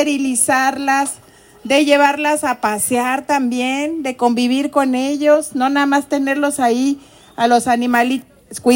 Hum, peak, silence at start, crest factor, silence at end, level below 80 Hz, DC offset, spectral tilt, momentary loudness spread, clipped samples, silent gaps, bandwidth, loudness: none; 0 dBFS; 0 s; 16 dB; 0 s; -60 dBFS; under 0.1%; -2.5 dB/octave; 7 LU; under 0.1%; none; 16.5 kHz; -16 LUFS